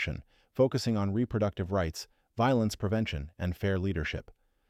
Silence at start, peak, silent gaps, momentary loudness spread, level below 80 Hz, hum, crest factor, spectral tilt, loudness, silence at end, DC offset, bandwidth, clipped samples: 0 s; -14 dBFS; none; 13 LU; -48 dBFS; none; 16 dB; -6.5 dB/octave; -31 LUFS; 0.4 s; under 0.1%; 15 kHz; under 0.1%